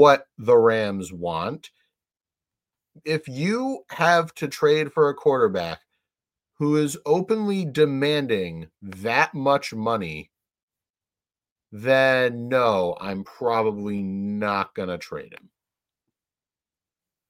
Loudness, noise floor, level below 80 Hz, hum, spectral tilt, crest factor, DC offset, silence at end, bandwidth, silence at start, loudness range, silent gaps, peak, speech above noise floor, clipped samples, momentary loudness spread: -23 LUFS; under -90 dBFS; -62 dBFS; none; -5.5 dB/octave; 22 dB; under 0.1%; 1.95 s; 16 kHz; 0 s; 5 LU; 10.63-10.68 s, 10.90-10.94 s, 11.51-11.56 s; -2 dBFS; over 68 dB; under 0.1%; 13 LU